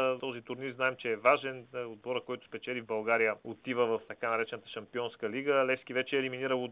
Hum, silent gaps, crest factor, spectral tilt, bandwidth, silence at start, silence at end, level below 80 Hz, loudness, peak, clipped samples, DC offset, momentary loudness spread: none; none; 22 dB; -2.5 dB/octave; 4 kHz; 0 s; 0 s; -78 dBFS; -33 LUFS; -10 dBFS; under 0.1%; under 0.1%; 12 LU